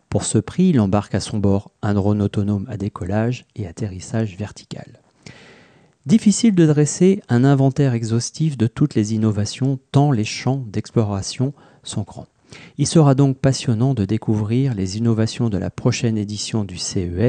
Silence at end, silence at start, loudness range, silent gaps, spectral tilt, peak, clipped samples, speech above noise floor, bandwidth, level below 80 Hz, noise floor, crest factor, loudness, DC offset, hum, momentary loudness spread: 0 s; 0.1 s; 6 LU; none; -6.5 dB/octave; -4 dBFS; under 0.1%; 33 dB; 9.8 kHz; -50 dBFS; -51 dBFS; 16 dB; -19 LUFS; under 0.1%; none; 13 LU